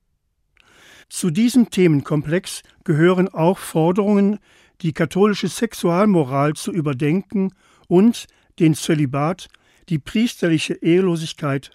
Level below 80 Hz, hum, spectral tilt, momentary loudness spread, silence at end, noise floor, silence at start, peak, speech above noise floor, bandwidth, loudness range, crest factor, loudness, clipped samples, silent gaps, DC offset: -56 dBFS; none; -6.5 dB/octave; 10 LU; 0.05 s; -68 dBFS; 1.1 s; -4 dBFS; 50 dB; 15.5 kHz; 2 LU; 16 dB; -19 LUFS; under 0.1%; none; under 0.1%